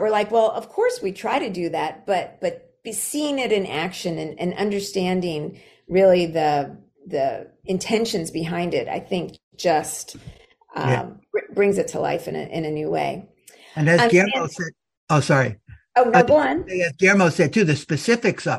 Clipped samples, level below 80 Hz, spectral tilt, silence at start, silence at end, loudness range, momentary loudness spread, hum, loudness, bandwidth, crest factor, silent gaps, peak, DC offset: under 0.1%; -56 dBFS; -5 dB/octave; 0 s; 0 s; 6 LU; 13 LU; none; -21 LUFS; 14.5 kHz; 22 dB; 9.43-9.51 s, 14.97-15.07 s; 0 dBFS; under 0.1%